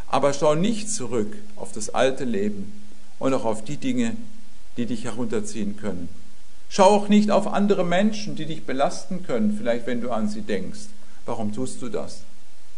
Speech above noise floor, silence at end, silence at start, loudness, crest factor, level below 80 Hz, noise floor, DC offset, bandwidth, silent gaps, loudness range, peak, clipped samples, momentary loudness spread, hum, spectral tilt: 27 dB; 0.55 s; 0.1 s; -24 LUFS; 22 dB; -54 dBFS; -51 dBFS; 7%; 11 kHz; none; 7 LU; -2 dBFS; under 0.1%; 18 LU; none; -5 dB/octave